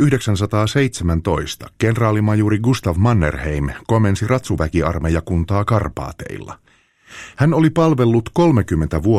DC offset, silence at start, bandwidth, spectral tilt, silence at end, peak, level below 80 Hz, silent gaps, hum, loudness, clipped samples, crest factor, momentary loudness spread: under 0.1%; 0 s; 14 kHz; -7 dB/octave; 0 s; -2 dBFS; -32 dBFS; none; none; -17 LUFS; under 0.1%; 14 dB; 13 LU